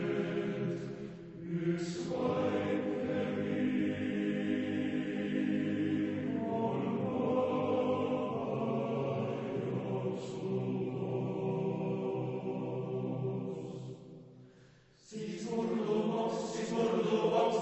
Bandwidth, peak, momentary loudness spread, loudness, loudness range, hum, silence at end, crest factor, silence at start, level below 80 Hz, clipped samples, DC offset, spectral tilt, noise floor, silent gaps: 8.2 kHz; -18 dBFS; 8 LU; -35 LUFS; 5 LU; none; 0 s; 16 dB; 0 s; -70 dBFS; under 0.1%; under 0.1%; -7 dB/octave; -61 dBFS; none